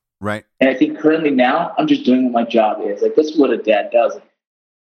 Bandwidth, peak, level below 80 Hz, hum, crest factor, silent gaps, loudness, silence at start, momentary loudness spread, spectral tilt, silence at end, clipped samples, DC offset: 9 kHz; -2 dBFS; -66 dBFS; none; 14 dB; none; -16 LUFS; 0.2 s; 6 LU; -6 dB/octave; 0.65 s; under 0.1%; under 0.1%